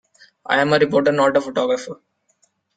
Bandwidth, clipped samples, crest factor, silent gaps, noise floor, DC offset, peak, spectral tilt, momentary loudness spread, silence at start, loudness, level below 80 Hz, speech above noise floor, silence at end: 9.2 kHz; under 0.1%; 18 dB; none; -64 dBFS; under 0.1%; -2 dBFS; -5 dB/octave; 20 LU; 0.5 s; -18 LUFS; -62 dBFS; 47 dB; 0.85 s